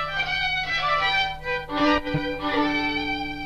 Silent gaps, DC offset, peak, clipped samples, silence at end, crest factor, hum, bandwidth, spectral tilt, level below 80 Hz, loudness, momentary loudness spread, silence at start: none; under 0.1%; -8 dBFS; under 0.1%; 0 s; 16 dB; none; 13.5 kHz; -5 dB/octave; -42 dBFS; -23 LUFS; 6 LU; 0 s